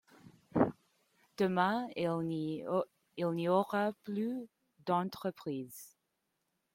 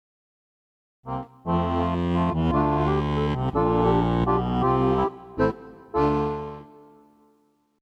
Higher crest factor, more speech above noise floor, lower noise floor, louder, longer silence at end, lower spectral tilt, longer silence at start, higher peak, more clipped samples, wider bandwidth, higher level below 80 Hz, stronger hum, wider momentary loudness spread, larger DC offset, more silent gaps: first, 22 dB vs 16 dB; first, 49 dB vs 42 dB; first, -83 dBFS vs -65 dBFS; second, -35 LUFS vs -24 LUFS; second, 0.85 s vs 1.15 s; second, -7 dB/octave vs -9 dB/octave; second, 0.25 s vs 1.05 s; second, -14 dBFS vs -8 dBFS; neither; first, 16.5 kHz vs 7.8 kHz; second, -74 dBFS vs -38 dBFS; neither; about the same, 14 LU vs 13 LU; neither; neither